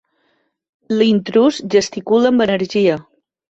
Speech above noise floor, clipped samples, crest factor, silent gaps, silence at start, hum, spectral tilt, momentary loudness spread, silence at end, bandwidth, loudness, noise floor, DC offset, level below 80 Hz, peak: 50 dB; under 0.1%; 14 dB; none; 0.9 s; none; -5.5 dB/octave; 4 LU; 0.5 s; 8.2 kHz; -16 LUFS; -64 dBFS; under 0.1%; -58 dBFS; -2 dBFS